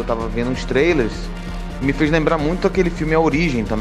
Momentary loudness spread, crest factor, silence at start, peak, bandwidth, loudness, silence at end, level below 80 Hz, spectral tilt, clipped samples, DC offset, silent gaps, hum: 11 LU; 16 dB; 0 s; -2 dBFS; 12 kHz; -18 LUFS; 0 s; -28 dBFS; -6.5 dB/octave; under 0.1%; under 0.1%; none; none